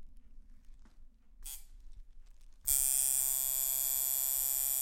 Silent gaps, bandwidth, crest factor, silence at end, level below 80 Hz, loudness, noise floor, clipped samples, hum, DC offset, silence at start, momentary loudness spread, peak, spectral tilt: none; 17 kHz; 26 dB; 0 s; -54 dBFS; -29 LUFS; -55 dBFS; under 0.1%; none; under 0.1%; 0 s; 19 LU; -10 dBFS; 1.5 dB/octave